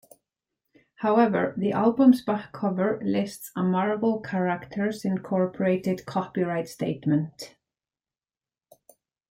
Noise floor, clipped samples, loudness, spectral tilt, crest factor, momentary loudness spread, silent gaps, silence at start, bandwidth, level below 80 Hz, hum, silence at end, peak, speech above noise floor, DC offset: under -90 dBFS; under 0.1%; -25 LUFS; -7.5 dB/octave; 18 dB; 10 LU; none; 1 s; 16 kHz; -66 dBFS; none; 1.85 s; -8 dBFS; over 65 dB; under 0.1%